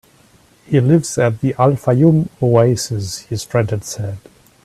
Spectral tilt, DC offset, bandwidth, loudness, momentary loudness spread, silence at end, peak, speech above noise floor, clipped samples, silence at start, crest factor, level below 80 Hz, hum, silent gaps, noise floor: -6.5 dB/octave; under 0.1%; 14 kHz; -16 LUFS; 12 LU; 0.45 s; 0 dBFS; 35 dB; under 0.1%; 0.7 s; 16 dB; -50 dBFS; none; none; -50 dBFS